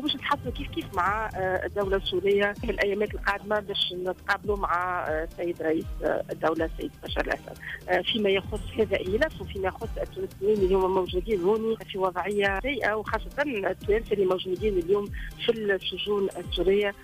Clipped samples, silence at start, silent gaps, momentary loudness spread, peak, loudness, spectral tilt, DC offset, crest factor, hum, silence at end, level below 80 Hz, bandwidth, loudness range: under 0.1%; 0 s; none; 7 LU; -12 dBFS; -27 LUFS; -5.5 dB/octave; under 0.1%; 14 dB; none; 0 s; -42 dBFS; 15.5 kHz; 2 LU